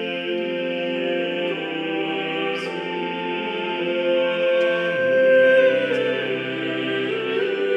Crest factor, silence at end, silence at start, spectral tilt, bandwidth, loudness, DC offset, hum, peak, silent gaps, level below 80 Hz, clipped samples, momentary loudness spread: 14 dB; 0 s; 0 s; -6 dB/octave; 7.6 kHz; -21 LUFS; under 0.1%; none; -8 dBFS; none; -74 dBFS; under 0.1%; 10 LU